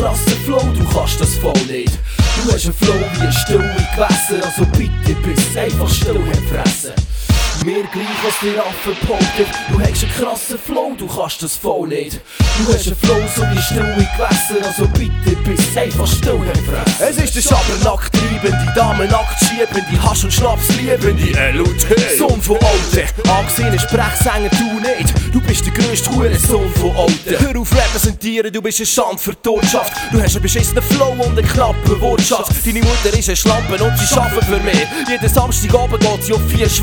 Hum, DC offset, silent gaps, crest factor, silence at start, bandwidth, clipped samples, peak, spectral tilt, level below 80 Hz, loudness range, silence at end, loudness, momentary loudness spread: none; under 0.1%; none; 14 dB; 0 s; over 20 kHz; under 0.1%; 0 dBFS; -4.5 dB/octave; -22 dBFS; 4 LU; 0 s; -14 LUFS; 5 LU